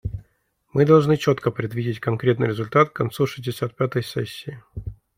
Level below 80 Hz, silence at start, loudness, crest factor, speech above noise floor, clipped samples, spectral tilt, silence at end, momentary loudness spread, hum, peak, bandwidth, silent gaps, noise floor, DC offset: -48 dBFS; 0.05 s; -22 LUFS; 18 dB; 45 dB; under 0.1%; -7 dB/octave; 0.25 s; 20 LU; none; -4 dBFS; 16 kHz; none; -66 dBFS; under 0.1%